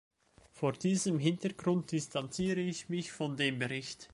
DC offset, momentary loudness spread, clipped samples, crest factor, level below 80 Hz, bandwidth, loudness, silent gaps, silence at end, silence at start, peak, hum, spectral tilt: under 0.1%; 6 LU; under 0.1%; 16 dB; -68 dBFS; 11.5 kHz; -34 LUFS; none; 0.1 s; 0.55 s; -18 dBFS; none; -5 dB/octave